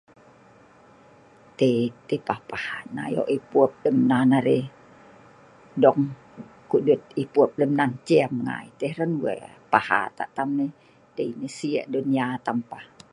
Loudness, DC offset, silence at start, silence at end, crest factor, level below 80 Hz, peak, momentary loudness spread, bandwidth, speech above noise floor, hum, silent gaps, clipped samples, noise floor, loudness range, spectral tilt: -24 LUFS; under 0.1%; 1.6 s; 0.3 s; 24 dB; -68 dBFS; 0 dBFS; 12 LU; 11 kHz; 30 dB; none; none; under 0.1%; -53 dBFS; 4 LU; -7 dB/octave